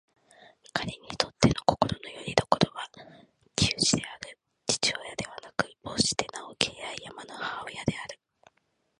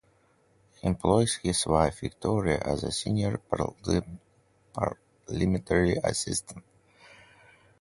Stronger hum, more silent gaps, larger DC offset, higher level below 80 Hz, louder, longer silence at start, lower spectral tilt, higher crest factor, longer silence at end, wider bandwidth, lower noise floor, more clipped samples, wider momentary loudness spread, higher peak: neither; neither; neither; second, -52 dBFS vs -46 dBFS; about the same, -29 LUFS vs -28 LUFS; second, 0.4 s vs 0.85 s; second, -3.5 dB/octave vs -5 dB/octave; first, 30 dB vs 22 dB; second, 0.85 s vs 1.2 s; about the same, 11.5 kHz vs 11.5 kHz; first, -74 dBFS vs -65 dBFS; neither; about the same, 15 LU vs 14 LU; first, -2 dBFS vs -6 dBFS